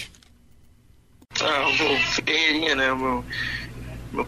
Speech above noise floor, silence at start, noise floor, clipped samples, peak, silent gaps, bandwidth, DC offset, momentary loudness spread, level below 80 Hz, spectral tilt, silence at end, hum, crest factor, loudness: 31 dB; 0 s; -54 dBFS; under 0.1%; -8 dBFS; none; 14 kHz; under 0.1%; 14 LU; -46 dBFS; -3 dB/octave; 0 s; none; 18 dB; -22 LUFS